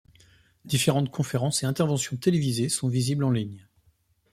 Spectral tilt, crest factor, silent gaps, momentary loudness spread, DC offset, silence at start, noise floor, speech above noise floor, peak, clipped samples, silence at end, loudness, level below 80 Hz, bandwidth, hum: -5 dB/octave; 20 dB; none; 4 LU; under 0.1%; 0.65 s; -66 dBFS; 41 dB; -8 dBFS; under 0.1%; 0.75 s; -26 LUFS; -60 dBFS; 15 kHz; none